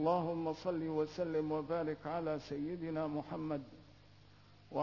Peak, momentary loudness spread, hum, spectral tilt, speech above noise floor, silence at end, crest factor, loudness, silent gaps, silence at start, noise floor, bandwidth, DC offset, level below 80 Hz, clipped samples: -20 dBFS; 6 LU; none; -6.5 dB/octave; 24 dB; 0 s; 18 dB; -39 LUFS; none; 0 s; -62 dBFS; 6 kHz; under 0.1%; -68 dBFS; under 0.1%